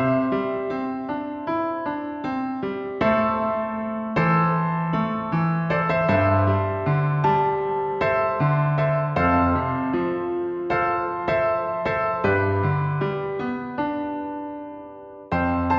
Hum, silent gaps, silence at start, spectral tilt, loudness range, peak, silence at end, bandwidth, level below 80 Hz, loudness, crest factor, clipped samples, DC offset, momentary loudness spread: none; none; 0 s; -9.5 dB/octave; 4 LU; -8 dBFS; 0 s; 6 kHz; -48 dBFS; -23 LUFS; 16 dB; under 0.1%; under 0.1%; 9 LU